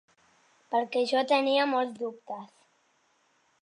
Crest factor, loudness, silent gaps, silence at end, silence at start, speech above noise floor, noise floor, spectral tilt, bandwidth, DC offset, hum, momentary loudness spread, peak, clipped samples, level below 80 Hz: 20 dB; -27 LUFS; none; 1.15 s; 0.7 s; 42 dB; -69 dBFS; -3.5 dB/octave; 10.5 kHz; under 0.1%; none; 17 LU; -12 dBFS; under 0.1%; -86 dBFS